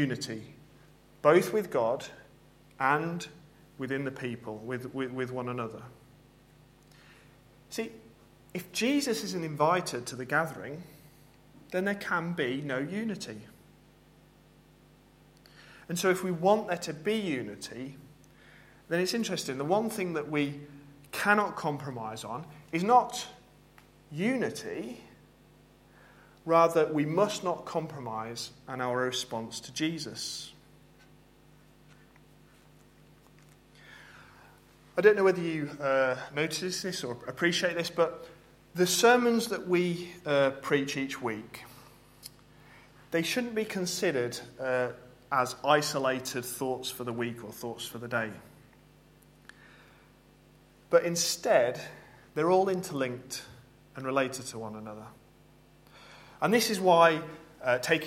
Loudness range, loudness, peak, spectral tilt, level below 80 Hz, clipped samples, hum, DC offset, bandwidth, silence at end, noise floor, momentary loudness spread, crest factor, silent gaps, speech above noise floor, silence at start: 10 LU; -30 LUFS; -8 dBFS; -4 dB/octave; -66 dBFS; under 0.1%; none; under 0.1%; 16.5 kHz; 0 s; -59 dBFS; 18 LU; 24 dB; none; 29 dB; 0 s